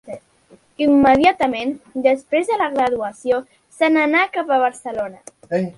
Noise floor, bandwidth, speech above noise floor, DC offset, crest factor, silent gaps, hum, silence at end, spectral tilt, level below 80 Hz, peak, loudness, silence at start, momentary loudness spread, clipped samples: -52 dBFS; 11.5 kHz; 35 dB; under 0.1%; 18 dB; none; none; 0.05 s; -5.5 dB/octave; -52 dBFS; 0 dBFS; -18 LUFS; 0.05 s; 13 LU; under 0.1%